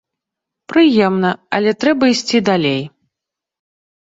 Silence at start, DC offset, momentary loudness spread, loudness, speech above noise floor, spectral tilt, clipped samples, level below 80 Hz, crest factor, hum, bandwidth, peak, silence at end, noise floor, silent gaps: 0.7 s; under 0.1%; 7 LU; -15 LUFS; 70 dB; -5 dB/octave; under 0.1%; -58 dBFS; 14 dB; none; 8 kHz; -2 dBFS; 1.15 s; -83 dBFS; none